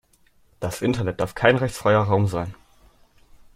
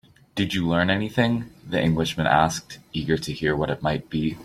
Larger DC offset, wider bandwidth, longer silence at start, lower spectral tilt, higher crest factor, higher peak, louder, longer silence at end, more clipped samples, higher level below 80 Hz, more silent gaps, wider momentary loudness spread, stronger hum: neither; about the same, 15.5 kHz vs 15 kHz; first, 0.6 s vs 0.35 s; about the same, -6 dB/octave vs -5.5 dB/octave; about the same, 22 dB vs 20 dB; about the same, -2 dBFS vs -4 dBFS; about the same, -22 LUFS vs -24 LUFS; first, 1.05 s vs 0 s; neither; about the same, -50 dBFS vs -48 dBFS; neither; first, 12 LU vs 9 LU; neither